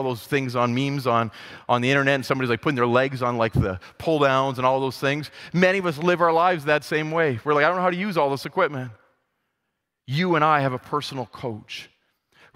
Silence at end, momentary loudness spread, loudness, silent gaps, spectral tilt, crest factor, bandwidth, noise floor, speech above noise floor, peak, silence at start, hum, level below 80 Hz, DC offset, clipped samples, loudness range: 0.7 s; 12 LU; -22 LUFS; none; -6 dB/octave; 20 dB; 16 kHz; -79 dBFS; 57 dB; -4 dBFS; 0 s; none; -50 dBFS; under 0.1%; under 0.1%; 4 LU